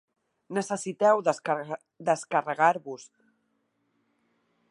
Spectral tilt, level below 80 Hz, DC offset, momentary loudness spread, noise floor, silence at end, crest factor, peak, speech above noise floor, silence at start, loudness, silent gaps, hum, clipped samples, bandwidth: -4.5 dB/octave; -84 dBFS; under 0.1%; 12 LU; -74 dBFS; 1.65 s; 22 dB; -8 dBFS; 48 dB; 0.5 s; -27 LUFS; none; none; under 0.1%; 11.5 kHz